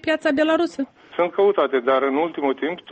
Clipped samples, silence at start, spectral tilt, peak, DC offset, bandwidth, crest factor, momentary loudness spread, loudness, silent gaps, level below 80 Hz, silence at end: under 0.1%; 0.05 s; -5 dB/octave; -8 dBFS; under 0.1%; 8.4 kHz; 14 dB; 7 LU; -21 LUFS; none; -64 dBFS; 0 s